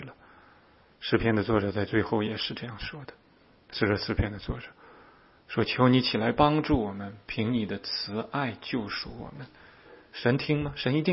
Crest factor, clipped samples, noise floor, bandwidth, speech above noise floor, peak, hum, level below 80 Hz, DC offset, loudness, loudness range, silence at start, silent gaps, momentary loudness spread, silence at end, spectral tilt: 22 dB; under 0.1%; -59 dBFS; 5.8 kHz; 31 dB; -6 dBFS; none; -48 dBFS; under 0.1%; -28 LUFS; 6 LU; 0 s; none; 16 LU; 0 s; -10 dB/octave